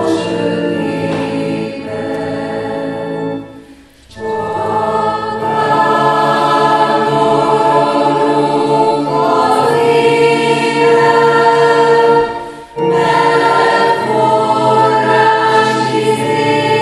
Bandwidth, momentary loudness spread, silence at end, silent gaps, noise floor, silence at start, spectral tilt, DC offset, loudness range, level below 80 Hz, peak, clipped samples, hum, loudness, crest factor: 12 kHz; 10 LU; 0 s; none; -40 dBFS; 0 s; -5.5 dB/octave; under 0.1%; 9 LU; -50 dBFS; 0 dBFS; under 0.1%; none; -12 LUFS; 12 dB